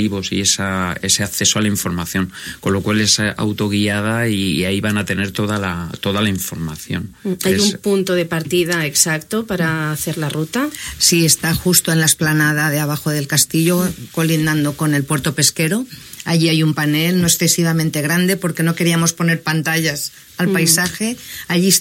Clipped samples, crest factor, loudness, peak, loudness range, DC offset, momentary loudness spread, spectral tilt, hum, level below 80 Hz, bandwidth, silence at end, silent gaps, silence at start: under 0.1%; 18 dB; -16 LUFS; 0 dBFS; 4 LU; under 0.1%; 8 LU; -3.5 dB/octave; none; -46 dBFS; 16.5 kHz; 0 s; none; 0 s